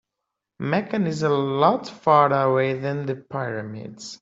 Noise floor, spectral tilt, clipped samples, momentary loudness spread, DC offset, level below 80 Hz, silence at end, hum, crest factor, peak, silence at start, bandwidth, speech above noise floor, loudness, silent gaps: -83 dBFS; -6.5 dB/octave; under 0.1%; 15 LU; under 0.1%; -64 dBFS; 0.05 s; none; 18 dB; -4 dBFS; 0.6 s; 8 kHz; 61 dB; -22 LUFS; none